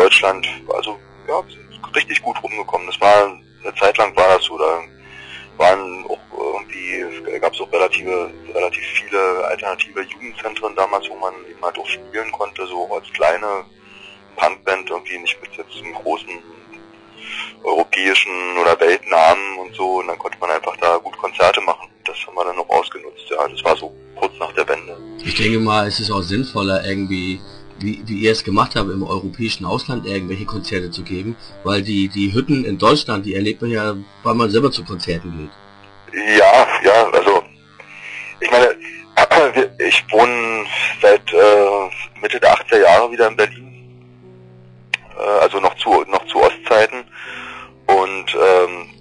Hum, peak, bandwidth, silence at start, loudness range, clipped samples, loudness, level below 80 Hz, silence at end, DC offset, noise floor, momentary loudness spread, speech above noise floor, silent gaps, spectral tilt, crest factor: none; -2 dBFS; 10.5 kHz; 0 s; 8 LU; under 0.1%; -17 LUFS; -48 dBFS; 0.1 s; under 0.1%; -43 dBFS; 15 LU; 26 dB; none; -4.5 dB/octave; 14 dB